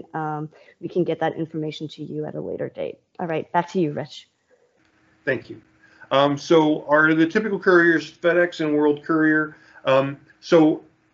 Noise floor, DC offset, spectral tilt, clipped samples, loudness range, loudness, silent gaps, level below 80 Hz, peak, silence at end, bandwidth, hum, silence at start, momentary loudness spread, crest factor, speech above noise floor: -62 dBFS; under 0.1%; -6.5 dB/octave; under 0.1%; 10 LU; -21 LUFS; none; -70 dBFS; -4 dBFS; 0.35 s; 7.4 kHz; none; 0.15 s; 15 LU; 18 dB; 41 dB